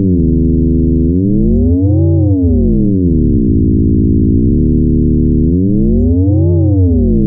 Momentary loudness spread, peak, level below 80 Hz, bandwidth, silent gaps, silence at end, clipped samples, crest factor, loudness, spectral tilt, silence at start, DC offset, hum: 1 LU; -2 dBFS; -18 dBFS; 1 kHz; none; 0 s; under 0.1%; 8 dB; -11 LUFS; -18 dB/octave; 0 s; under 0.1%; none